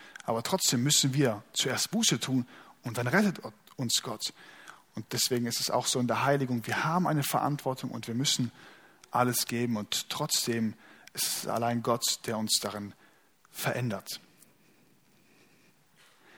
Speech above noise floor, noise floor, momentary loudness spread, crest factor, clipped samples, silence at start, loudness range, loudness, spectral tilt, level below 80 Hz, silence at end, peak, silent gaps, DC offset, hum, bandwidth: 34 dB; -64 dBFS; 14 LU; 22 dB; under 0.1%; 0 s; 5 LU; -29 LUFS; -3.5 dB/octave; -72 dBFS; 2.2 s; -10 dBFS; none; under 0.1%; none; 19.5 kHz